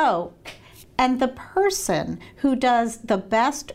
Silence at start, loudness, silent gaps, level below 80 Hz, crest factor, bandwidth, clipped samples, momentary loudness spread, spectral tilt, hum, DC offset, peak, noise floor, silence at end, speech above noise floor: 0 s; -23 LUFS; none; -50 dBFS; 14 dB; 16 kHz; under 0.1%; 12 LU; -4 dB/octave; none; under 0.1%; -8 dBFS; -44 dBFS; 0 s; 22 dB